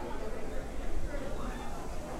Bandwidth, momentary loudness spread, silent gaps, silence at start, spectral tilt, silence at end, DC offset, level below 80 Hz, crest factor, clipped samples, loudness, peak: 12.5 kHz; 2 LU; none; 0 s; -5.5 dB/octave; 0 s; under 0.1%; -38 dBFS; 12 dB; under 0.1%; -41 LUFS; -20 dBFS